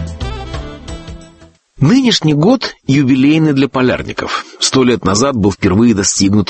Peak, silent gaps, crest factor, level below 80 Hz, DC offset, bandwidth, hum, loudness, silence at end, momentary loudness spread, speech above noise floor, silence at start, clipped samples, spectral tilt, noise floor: 0 dBFS; none; 12 dB; -34 dBFS; under 0.1%; 8.8 kHz; none; -12 LUFS; 0.05 s; 16 LU; 32 dB; 0 s; under 0.1%; -5 dB/octave; -43 dBFS